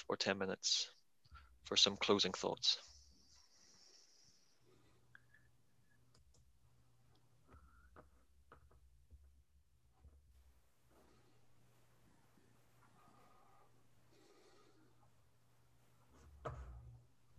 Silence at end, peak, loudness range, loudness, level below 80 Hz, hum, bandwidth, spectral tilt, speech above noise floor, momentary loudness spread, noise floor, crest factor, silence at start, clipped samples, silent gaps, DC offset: 0.4 s; -18 dBFS; 23 LU; -37 LUFS; -68 dBFS; none; 14 kHz; -2 dB/octave; 38 dB; 25 LU; -76 dBFS; 28 dB; 0 s; under 0.1%; none; under 0.1%